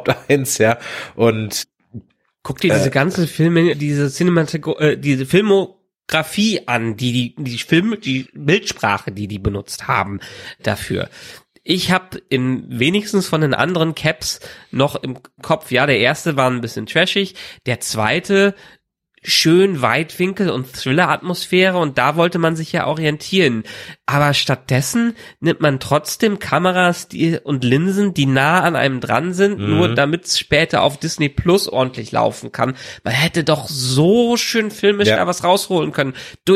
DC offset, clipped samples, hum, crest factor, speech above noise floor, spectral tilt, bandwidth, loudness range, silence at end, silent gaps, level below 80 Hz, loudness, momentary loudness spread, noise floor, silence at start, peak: under 0.1%; under 0.1%; none; 16 dB; 22 dB; -5 dB/octave; 16 kHz; 4 LU; 0 s; none; -46 dBFS; -17 LUFS; 9 LU; -38 dBFS; 0 s; 0 dBFS